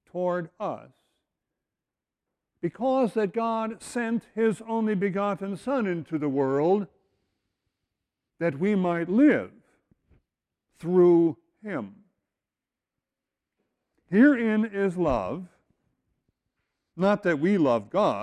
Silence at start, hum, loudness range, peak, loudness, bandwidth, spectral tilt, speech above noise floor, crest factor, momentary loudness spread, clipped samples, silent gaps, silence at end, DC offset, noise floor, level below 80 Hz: 0.15 s; none; 5 LU; -8 dBFS; -25 LUFS; 11.5 kHz; -7.5 dB/octave; 65 dB; 18 dB; 15 LU; under 0.1%; none; 0 s; under 0.1%; -89 dBFS; -58 dBFS